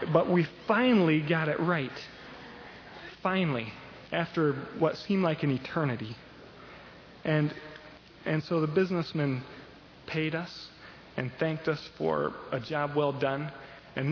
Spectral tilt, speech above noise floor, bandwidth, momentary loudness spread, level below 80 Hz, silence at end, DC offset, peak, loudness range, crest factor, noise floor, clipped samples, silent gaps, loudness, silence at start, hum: -8 dB/octave; 22 dB; 5.4 kHz; 20 LU; -64 dBFS; 0 s; under 0.1%; -8 dBFS; 5 LU; 22 dB; -51 dBFS; under 0.1%; none; -30 LUFS; 0 s; none